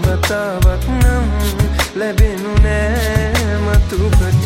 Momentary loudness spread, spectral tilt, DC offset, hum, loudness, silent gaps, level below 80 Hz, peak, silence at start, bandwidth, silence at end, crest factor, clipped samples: 2 LU; -5.5 dB/octave; under 0.1%; none; -15 LUFS; none; -16 dBFS; 0 dBFS; 0 s; 16.5 kHz; 0 s; 14 dB; under 0.1%